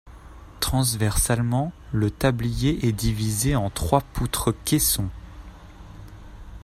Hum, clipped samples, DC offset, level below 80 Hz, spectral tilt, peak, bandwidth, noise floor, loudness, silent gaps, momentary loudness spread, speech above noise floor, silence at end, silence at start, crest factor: none; under 0.1%; under 0.1%; -36 dBFS; -4.5 dB/octave; -4 dBFS; 16 kHz; -43 dBFS; -23 LUFS; none; 22 LU; 20 dB; 0 s; 0.05 s; 20 dB